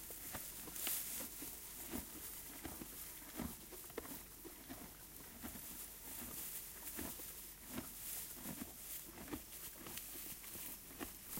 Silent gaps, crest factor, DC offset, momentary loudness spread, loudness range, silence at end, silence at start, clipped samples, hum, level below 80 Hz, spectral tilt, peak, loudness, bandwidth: none; 24 dB; under 0.1%; 6 LU; 4 LU; 0 s; 0 s; under 0.1%; none; -64 dBFS; -2.5 dB/octave; -26 dBFS; -47 LUFS; 16.5 kHz